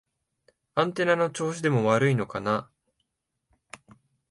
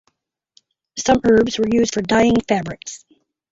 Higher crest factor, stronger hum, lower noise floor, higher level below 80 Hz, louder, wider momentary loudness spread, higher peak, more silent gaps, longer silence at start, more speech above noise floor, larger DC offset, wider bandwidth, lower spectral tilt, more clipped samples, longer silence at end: about the same, 20 dB vs 16 dB; neither; first, -80 dBFS vs -68 dBFS; second, -66 dBFS vs -44 dBFS; second, -26 LUFS vs -17 LUFS; second, 7 LU vs 18 LU; second, -8 dBFS vs -2 dBFS; neither; second, 0.75 s vs 0.95 s; first, 55 dB vs 51 dB; neither; first, 11.5 kHz vs 8 kHz; first, -6 dB/octave vs -4.5 dB/octave; neither; first, 1.65 s vs 0.55 s